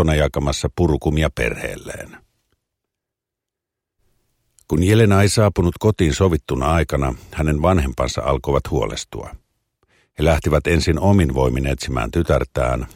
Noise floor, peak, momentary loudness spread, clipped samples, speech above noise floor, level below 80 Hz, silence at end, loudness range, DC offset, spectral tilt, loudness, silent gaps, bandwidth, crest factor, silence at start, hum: -84 dBFS; -2 dBFS; 12 LU; under 0.1%; 66 dB; -28 dBFS; 0.1 s; 8 LU; under 0.1%; -6 dB/octave; -19 LUFS; none; 16.5 kHz; 18 dB; 0 s; none